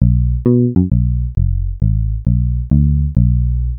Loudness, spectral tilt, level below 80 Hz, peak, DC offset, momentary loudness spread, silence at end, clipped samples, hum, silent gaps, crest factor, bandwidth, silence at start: -16 LUFS; -15.5 dB/octave; -18 dBFS; -2 dBFS; under 0.1%; 5 LU; 0 s; under 0.1%; none; none; 12 dB; 1.3 kHz; 0 s